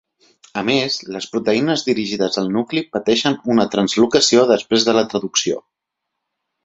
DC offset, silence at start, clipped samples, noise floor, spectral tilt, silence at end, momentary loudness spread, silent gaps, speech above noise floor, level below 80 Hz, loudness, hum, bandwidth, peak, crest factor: under 0.1%; 0.55 s; under 0.1%; -79 dBFS; -3.5 dB/octave; 1.05 s; 10 LU; none; 62 dB; -58 dBFS; -17 LUFS; none; 8.2 kHz; -2 dBFS; 16 dB